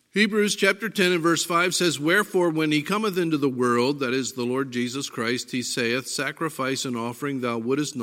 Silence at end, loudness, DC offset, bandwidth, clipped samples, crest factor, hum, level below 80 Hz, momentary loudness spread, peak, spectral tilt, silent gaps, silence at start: 0 s; -24 LUFS; under 0.1%; 16.5 kHz; under 0.1%; 18 dB; none; -74 dBFS; 7 LU; -4 dBFS; -4 dB/octave; none; 0.15 s